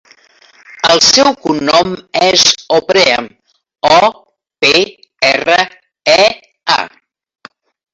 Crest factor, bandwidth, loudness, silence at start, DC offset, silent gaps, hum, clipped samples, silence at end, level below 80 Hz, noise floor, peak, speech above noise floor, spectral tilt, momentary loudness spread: 12 dB; 16 kHz; -10 LUFS; 0.75 s; under 0.1%; none; none; under 0.1%; 1.05 s; -50 dBFS; -46 dBFS; 0 dBFS; 36 dB; -1.5 dB/octave; 10 LU